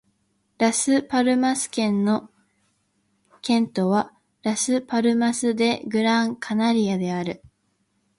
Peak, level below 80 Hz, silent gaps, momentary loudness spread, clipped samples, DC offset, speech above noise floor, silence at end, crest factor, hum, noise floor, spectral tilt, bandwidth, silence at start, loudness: -6 dBFS; -66 dBFS; none; 7 LU; under 0.1%; under 0.1%; 48 dB; 0.7 s; 16 dB; none; -70 dBFS; -4.5 dB/octave; 11.5 kHz; 0.6 s; -22 LUFS